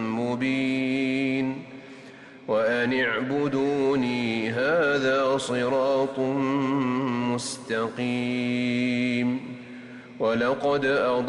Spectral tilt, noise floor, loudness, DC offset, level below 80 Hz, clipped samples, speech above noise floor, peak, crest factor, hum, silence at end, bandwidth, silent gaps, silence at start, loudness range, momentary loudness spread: -5.5 dB/octave; -45 dBFS; -25 LUFS; under 0.1%; -64 dBFS; under 0.1%; 21 dB; -14 dBFS; 12 dB; none; 0 s; 11.5 kHz; none; 0 s; 3 LU; 15 LU